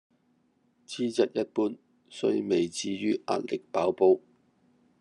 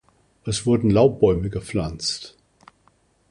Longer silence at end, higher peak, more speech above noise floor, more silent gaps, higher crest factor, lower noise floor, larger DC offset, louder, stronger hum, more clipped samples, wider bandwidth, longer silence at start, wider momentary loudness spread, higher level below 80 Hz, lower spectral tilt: second, 0.85 s vs 1.05 s; second, -10 dBFS vs -4 dBFS; about the same, 42 dB vs 41 dB; neither; about the same, 20 dB vs 18 dB; first, -69 dBFS vs -61 dBFS; neither; second, -28 LUFS vs -21 LUFS; neither; neither; about the same, 11 kHz vs 11.5 kHz; first, 0.9 s vs 0.45 s; second, 9 LU vs 15 LU; second, -80 dBFS vs -42 dBFS; about the same, -5 dB/octave vs -6 dB/octave